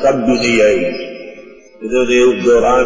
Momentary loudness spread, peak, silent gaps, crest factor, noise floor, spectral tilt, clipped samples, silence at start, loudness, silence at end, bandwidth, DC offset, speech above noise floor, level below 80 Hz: 18 LU; -2 dBFS; none; 10 dB; -37 dBFS; -4.5 dB/octave; under 0.1%; 0 s; -12 LUFS; 0 s; 7.6 kHz; under 0.1%; 26 dB; -40 dBFS